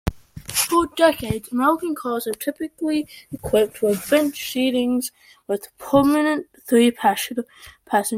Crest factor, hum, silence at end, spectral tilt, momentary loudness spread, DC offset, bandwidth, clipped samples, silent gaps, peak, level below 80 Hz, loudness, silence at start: 18 dB; none; 0 s; -4 dB/octave; 11 LU; under 0.1%; 16.5 kHz; under 0.1%; none; -4 dBFS; -44 dBFS; -21 LUFS; 0.05 s